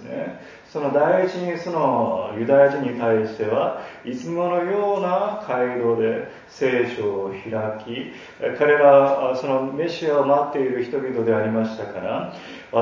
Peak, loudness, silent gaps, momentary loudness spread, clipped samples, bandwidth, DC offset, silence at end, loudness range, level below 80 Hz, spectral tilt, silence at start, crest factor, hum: -2 dBFS; -21 LUFS; none; 15 LU; under 0.1%; 7.4 kHz; under 0.1%; 0 s; 4 LU; -64 dBFS; -7 dB/octave; 0 s; 20 dB; none